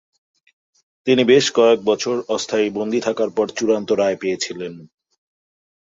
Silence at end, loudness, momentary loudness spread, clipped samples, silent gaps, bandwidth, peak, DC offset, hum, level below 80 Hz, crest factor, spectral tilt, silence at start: 1.1 s; -18 LUFS; 11 LU; under 0.1%; none; 7.8 kHz; -2 dBFS; under 0.1%; none; -64 dBFS; 18 dB; -4 dB/octave; 1.05 s